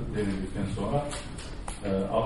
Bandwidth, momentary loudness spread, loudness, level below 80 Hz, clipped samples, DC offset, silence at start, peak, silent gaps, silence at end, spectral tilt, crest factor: 11.5 kHz; 10 LU; -32 LUFS; -40 dBFS; under 0.1%; 0.3%; 0 s; -12 dBFS; none; 0 s; -6 dB/octave; 18 dB